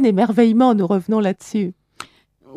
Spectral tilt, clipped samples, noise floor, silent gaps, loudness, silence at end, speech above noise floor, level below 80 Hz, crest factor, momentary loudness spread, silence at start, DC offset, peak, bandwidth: -7.5 dB/octave; under 0.1%; -49 dBFS; none; -17 LUFS; 0.85 s; 33 dB; -66 dBFS; 14 dB; 24 LU; 0 s; under 0.1%; -2 dBFS; 11 kHz